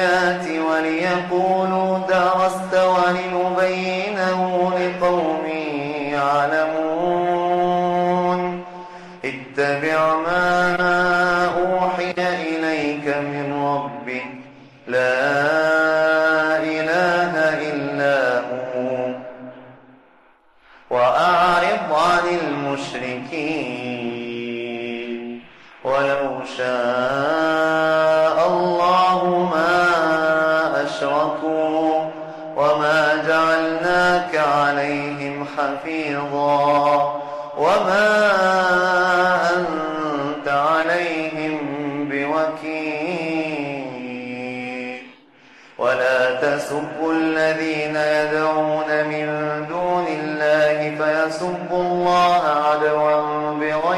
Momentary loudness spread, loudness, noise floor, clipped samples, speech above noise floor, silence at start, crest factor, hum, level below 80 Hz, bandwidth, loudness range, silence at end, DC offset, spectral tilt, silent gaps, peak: 11 LU; -19 LUFS; -54 dBFS; under 0.1%; 35 dB; 0 s; 12 dB; none; -56 dBFS; 12.5 kHz; 6 LU; 0 s; under 0.1%; -5.5 dB/octave; none; -8 dBFS